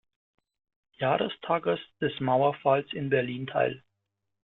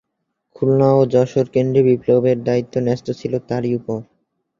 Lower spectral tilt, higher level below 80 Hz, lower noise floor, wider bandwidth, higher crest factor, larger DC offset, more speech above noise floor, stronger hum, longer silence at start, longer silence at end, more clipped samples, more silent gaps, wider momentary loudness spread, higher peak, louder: about the same, -9.5 dB/octave vs -8.5 dB/octave; second, -68 dBFS vs -56 dBFS; first, -82 dBFS vs -75 dBFS; second, 4.2 kHz vs 7.4 kHz; about the same, 20 dB vs 16 dB; neither; about the same, 55 dB vs 58 dB; neither; first, 1 s vs 0.6 s; about the same, 0.65 s vs 0.55 s; neither; neither; second, 6 LU vs 10 LU; second, -10 dBFS vs -2 dBFS; second, -28 LUFS vs -17 LUFS